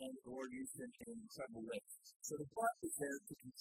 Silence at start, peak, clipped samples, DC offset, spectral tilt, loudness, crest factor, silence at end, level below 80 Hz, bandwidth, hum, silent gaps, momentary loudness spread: 0 s; -26 dBFS; under 0.1%; under 0.1%; -4 dB/octave; -47 LUFS; 22 dB; 0 s; -80 dBFS; 16 kHz; none; 2.16-2.20 s; 11 LU